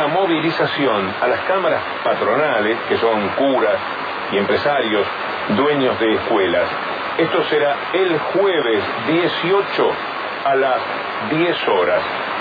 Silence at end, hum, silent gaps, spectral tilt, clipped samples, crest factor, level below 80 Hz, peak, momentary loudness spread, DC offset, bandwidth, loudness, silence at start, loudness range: 0 s; none; none; -7 dB/octave; under 0.1%; 14 dB; -60 dBFS; -4 dBFS; 5 LU; under 0.1%; 5 kHz; -18 LUFS; 0 s; 1 LU